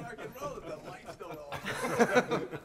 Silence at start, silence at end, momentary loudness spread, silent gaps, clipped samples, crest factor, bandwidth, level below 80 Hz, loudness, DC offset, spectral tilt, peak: 0 s; 0 s; 17 LU; none; under 0.1%; 22 dB; 16 kHz; -62 dBFS; -32 LUFS; under 0.1%; -4.5 dB/octave; -12 dBFS